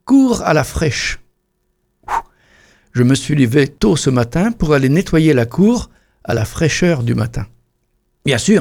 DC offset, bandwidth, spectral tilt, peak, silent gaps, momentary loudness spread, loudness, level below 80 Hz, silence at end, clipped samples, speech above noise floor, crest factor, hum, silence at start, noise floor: under 0.1%; 17 kHz; -6 dB/octave; 0 dBFS; none; 10 LU; -15 LUFS; -34 dBFS; 0 s; under 0.1%; 52 dB; 14 dB; none; 0.05 s; -66 dBFS